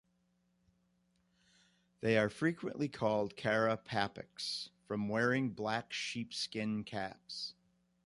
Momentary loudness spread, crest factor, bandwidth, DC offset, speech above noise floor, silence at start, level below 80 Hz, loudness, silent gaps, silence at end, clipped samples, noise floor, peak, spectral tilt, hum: 10 LU; 22 dB; 11.5 kHz; under 0.1%; 41 dB; 2 s; -72 dBFS; -37 LUFS; none; 0.55 s; under 0.1%; -77 dBFS; -16 dBFS; -5 dB/octave; none